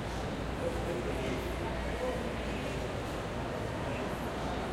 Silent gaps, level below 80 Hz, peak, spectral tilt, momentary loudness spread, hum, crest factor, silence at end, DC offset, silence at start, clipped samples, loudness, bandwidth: none; -44 dBFS; -22 dBFS; -5.5 dB/octave; 2 LU; none; 14 dB; 0 s; under 0.1%; 0 s; under 0.1%; -36 LUFS; 16 kHz